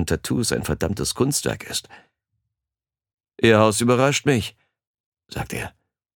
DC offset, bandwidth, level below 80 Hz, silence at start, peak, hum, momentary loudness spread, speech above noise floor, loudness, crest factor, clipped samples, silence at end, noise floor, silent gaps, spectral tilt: under 0.1%; 19 kHz; -46 dBFS; 0 s; -2 dBFS; none; 15 LU; over 69 dB; -21 LUFS; 22 dB; under 0.1%; 0.45 s; under -90 dBFS; 4.87-4.94 s, 5.00-5.12 s; -4.5 dB/octave